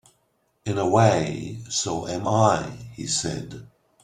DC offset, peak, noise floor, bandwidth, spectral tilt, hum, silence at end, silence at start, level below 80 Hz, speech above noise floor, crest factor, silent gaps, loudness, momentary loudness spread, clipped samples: under 0.1%; -4 dBFS; -69 dBFS; 11.5 kHz; -4.5 dB/octave; none; 0.4 s; 0.65 s; -54 dBFS; 46 dB; 22 dB; none; -23 LUFS; 17 LU; under 0.1%